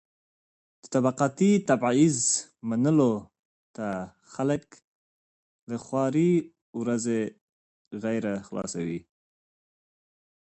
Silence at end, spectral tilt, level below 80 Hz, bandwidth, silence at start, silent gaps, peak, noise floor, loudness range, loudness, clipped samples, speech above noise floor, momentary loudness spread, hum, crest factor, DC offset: 1.45 s; -5.5 dB/octave; -66 dBFS; 8.8 kHz; 0.85 s; 3.39-3.74 s, 4.84-5.67 s, 6.62-6.73 s, 7.41-7.91 s; -10 dBFS; under -90 dBFS; 8 LU; -26 LUFS; under 0.1%; over 64 dB; 14 LU; none; 18 dB; under 0.1%